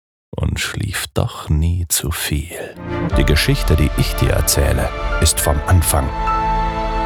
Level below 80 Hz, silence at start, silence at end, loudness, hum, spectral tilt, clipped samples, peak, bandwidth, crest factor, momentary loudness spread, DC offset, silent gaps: -22 dBFS; 0.35 s; 0 s; -17 LUFS; none; -4.5 dB/octave; under 0.1%; 0 dBFS; over 20 kHz; 16 dB; 8 LU; under 0.1%; none